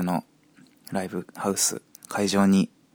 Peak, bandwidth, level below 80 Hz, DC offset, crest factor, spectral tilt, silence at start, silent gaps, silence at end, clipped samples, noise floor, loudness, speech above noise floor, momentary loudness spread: -8 dBFS; 20 kHz; -66 dBFS; under 0.1%; 18 dB; -4.5 dB/octave; 0 s; none; 0.25 s; under 0.1%; -57 dBFS; -25 LUFS; 33 dB; 13 LU